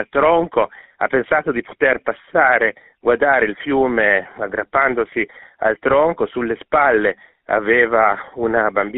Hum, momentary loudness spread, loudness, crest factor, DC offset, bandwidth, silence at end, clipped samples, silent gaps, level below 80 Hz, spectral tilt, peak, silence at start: none; 9 LU; -17 LUFS; 16 dB; under 0.1%; 4 kHz; 0 s; under 0.1%; none; -50 dBFS; -3 dB/octave; 0 dBFS; 0 s